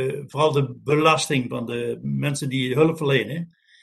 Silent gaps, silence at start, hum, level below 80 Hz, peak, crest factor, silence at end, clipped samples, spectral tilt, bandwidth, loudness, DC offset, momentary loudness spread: none; 0 s; none; -62 dBFS; -4 dBFS; 18 dB; 0.35 s; under 0.1%; -5.5 dB/octave; 12.5 kHz; -22 LUFS; under 0.1%; 10 LU